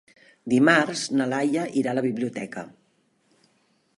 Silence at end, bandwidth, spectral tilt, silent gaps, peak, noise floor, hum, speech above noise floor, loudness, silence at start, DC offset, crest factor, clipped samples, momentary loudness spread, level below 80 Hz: 1.3 s; 11.5 kHz; -5 dB/octave; none; -4 dBFS; -67 dBFS; none; 44 dB; -23 LUFS; 0.45 s; under 0.1%; 20 dB; under 0.1%; 19 LU; -72 dBFS